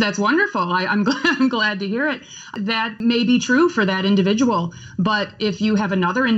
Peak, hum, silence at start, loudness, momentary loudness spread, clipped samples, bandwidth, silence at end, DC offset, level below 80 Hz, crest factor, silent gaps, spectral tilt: -4 dBFS; none; 0 s; -19 LUFS; 7 LU; under 0.1%; 8 kHz; 0 s; under 0.1%; -60 dBFS; 14 dB; none; -5 dB/octave